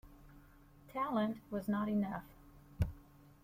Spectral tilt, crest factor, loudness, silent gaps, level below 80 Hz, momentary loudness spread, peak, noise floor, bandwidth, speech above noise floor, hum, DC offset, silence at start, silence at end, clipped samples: -8 dB/octave; 20 dB; -39 LUFS; none; -54 dBFS; 12 LU; -20 dBFS; -61 dBFS; 16 kHz; 24 dB; none; under 0.1%; 0.05 s; 0.4 s; under 0.1%